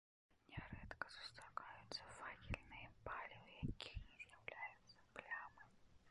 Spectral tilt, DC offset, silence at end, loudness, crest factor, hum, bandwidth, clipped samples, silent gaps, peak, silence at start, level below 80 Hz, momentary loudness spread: -4.5 dB/octave; under 0.1%; 0 s; -54 LUFS; 28 dB; none; 11 kHz; under 0.1%; none; -26 dBFS; 0.3 s; -64 dBFS; 8 LU